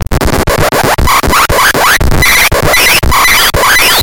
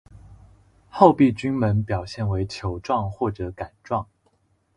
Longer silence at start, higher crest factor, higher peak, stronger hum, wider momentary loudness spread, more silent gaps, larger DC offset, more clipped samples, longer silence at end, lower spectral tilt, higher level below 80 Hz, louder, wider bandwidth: second, 0 s vs 0.3 s; second, 8 dB vs 24 dB; about the same, 0 dBFS vs 0 dBFS; neither; second, 5 LU vs 16 LU; neither; first, 5% vs under 0.1%; first, 2% vs under 0.1%; second, 0 s vs 0.7 s; second, -2.5 dB/octave vs -8 dB/octave; first, -16 dBFS vs -44 dBFS; first, -6 LUFS vs -23 LUFS; first, over 20 kHz vs 11 kHz